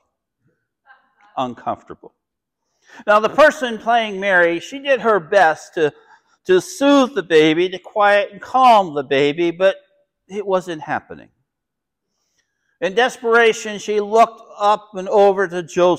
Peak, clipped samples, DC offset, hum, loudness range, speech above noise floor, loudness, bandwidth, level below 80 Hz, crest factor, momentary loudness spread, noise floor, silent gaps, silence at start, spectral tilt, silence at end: -4 dBFS; under 0.1%; under 0.1%; none; 8 LU; 65 dB; -17 LUFS; 14.5 kHz; -64 dBFS; 14 dB; 12 LU; -81 dBFS; none; 1.35 s; -4.5 dB/octave; 0 s